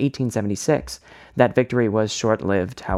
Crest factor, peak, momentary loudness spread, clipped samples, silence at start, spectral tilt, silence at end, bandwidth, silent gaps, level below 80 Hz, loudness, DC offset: 18 dB; -2 dBFS; 10 LU; under 0.1%; 0 s; -5.5 dB/octave; 0 s; 14.5 kHz; none; -50 dBFS; -21 LUFS; under 0.1%